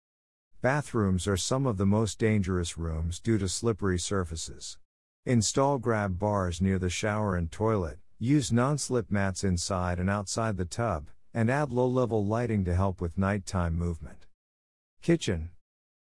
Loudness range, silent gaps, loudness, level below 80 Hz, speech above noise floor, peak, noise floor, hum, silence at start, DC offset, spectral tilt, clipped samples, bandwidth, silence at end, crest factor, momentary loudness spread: 2 LU; 4.85-5.23 s, 14.34-14.97 s; -29 LUFS; -50 dBFS; over 62 dB; -12 dBFS; under -90 dBFS; none; 0.65 s; 0.2%; -5.5 dB/octave; under 0.1%; 12 kHz; 0.65 s; 18 dB; 9 LU